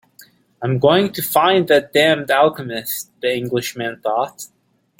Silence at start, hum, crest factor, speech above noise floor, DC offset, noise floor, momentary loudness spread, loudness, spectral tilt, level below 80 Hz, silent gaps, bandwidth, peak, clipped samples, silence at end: 0.6 s; none; 18 dB; 32 dB; under 0.1%; -49 dBFS; 11 LU; -17 LUFS; -4.5 dB/octave; -60 dBFS; none; 17 kHz; 0 dBFS; under 0.1%; 0.55 s